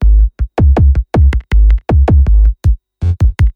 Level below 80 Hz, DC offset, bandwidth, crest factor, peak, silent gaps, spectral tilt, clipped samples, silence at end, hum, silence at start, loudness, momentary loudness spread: -10 dBFS; under 0.1%; 4.5 kHz; 8 dB; 0 dBFS; none; -9 dB/octave; under 0.1%; 0.05 s; none; 0 s; -12 LUFS; 6 LU